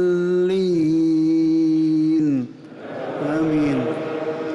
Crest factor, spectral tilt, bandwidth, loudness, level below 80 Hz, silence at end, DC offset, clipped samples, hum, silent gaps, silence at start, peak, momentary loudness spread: 6 dB; -8 dB/octave; 7.6 kHz; -20 LUFS; -58 dBFS; 0 s; under 0.1%; under 0.1%; none; none; 0 s; -12 dBFS; 11 LU